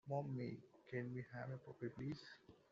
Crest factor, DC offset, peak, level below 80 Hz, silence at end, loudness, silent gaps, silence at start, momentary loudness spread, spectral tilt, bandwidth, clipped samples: 18 dB; under 0.1%; -32 dBFS; -78 dBFS; 0.15 s; -50 LUFS; none; 0.05 s; 11 LU; -7 dB/octave; 7.4 kHz; under 0.1%